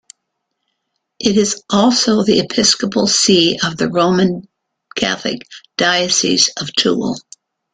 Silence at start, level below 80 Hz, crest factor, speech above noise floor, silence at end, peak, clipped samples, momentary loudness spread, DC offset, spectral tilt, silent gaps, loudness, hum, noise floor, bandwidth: 1.2 s; -52 dBFS; 16 dB; 59 dB; 0.55 s; 0 dBFS; under 0.1%; 12 LU; under 0.1%; -3 dB/octave; none; -14 LUFS; none; -74 dBFS; 9.6 kHz